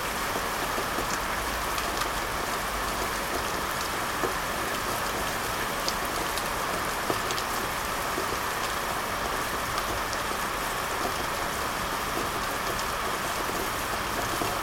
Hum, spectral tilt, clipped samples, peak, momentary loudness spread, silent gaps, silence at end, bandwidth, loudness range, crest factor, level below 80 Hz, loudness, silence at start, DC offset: none; -2.5 dB/octave; under 0.1%; -10 dBFS; 1 LU; none; 0 s; 17 kHz; 0 LU; 20 dB; -44 dBFS; -29 LUFS; 0 s; under 0.1%